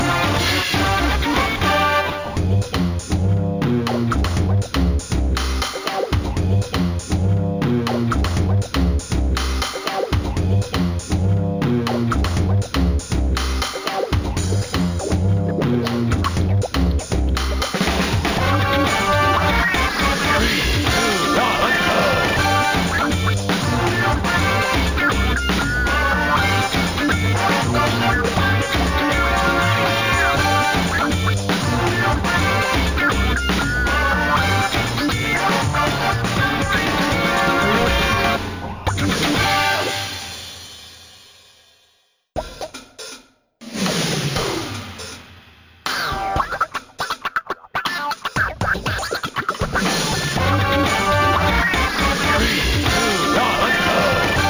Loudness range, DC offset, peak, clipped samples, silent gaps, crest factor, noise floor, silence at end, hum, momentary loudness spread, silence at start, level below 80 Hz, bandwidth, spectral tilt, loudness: 7 LU; under 0.1%; -4 dBFS; under 0.1%; none; 14 dB; -62 dBFS; 0 s; none; 7 LU; 0 s; -28 dBFS; over 20 kHz; -4.5 dB/octave; -19 LUFS